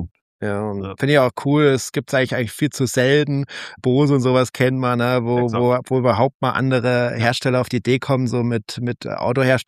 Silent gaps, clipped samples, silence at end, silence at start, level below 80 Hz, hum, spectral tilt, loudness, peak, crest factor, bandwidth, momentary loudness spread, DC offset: 0.11-0.15 s, 0.21-0.39 s, 6.35-6.40 s; under 0.1%; 0.05 s; 0 s; -54 dBFS; none; -6 dB/octave; -19 LUFS; -2 dBFS; 18 dB; 15 kHz; 8 LU; under 0.1%